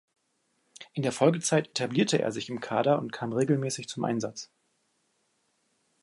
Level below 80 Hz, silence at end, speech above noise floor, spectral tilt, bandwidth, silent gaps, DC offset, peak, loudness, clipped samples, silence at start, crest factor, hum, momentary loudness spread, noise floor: -74 dBFS; 1.6 s; 47 dB; -5 dB/octave; 11.5 kHz; none; under 0.1%; -10 dBFS; -28 LUFS; under 0.1%; 0.8 s; 20 dB; none; 11 LU; -74 dBFS